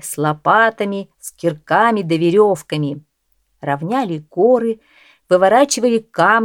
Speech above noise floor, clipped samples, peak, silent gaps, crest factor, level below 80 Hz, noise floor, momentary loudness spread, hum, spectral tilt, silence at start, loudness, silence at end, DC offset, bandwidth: 49 dB; under 0.1%; 0 dBFS; none; 16 dB; -64 dBFS; -65 dBFS; 11 LU; none; -5 dB/octave; 0.05 s; -16 LUFS; 0 s; under 0.1%; 17 kHz